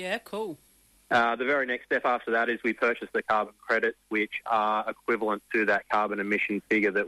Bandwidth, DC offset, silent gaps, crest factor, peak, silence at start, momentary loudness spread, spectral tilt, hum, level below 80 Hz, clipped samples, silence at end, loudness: 14.5 kHz; under 0.1%; none; 14 dB; -14 dBFS; 0 s; 5 LU; -5 dB/octave; none; -68 dBFS; under 0.1%; 0 s; -27 LUFS